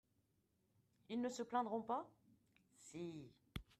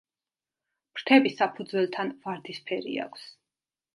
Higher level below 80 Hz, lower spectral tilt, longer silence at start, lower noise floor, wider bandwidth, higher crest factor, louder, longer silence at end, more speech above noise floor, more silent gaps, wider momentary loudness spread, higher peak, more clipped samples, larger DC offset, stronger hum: first, -72 dBFS vs -82 dBFS; about the same, -5.5 dB/octave vs -5.5 dB/octave; first, 1.1 s vs 0.95 s; second, -82 dBFS vs under -90 dBFS; first, 13.5 kHz vs 11.5 kHz; about the same, 22 dB vs 24 dB; second, -46 LUFS vs -27 LUFS; second, 0.15 s vs 0.65 s; second, 37 dB vs over 63 dB; neither; about the same, 16 LU vs 17 LU; second, -28 dBFS vs -6 dBFS; neither; neither; neither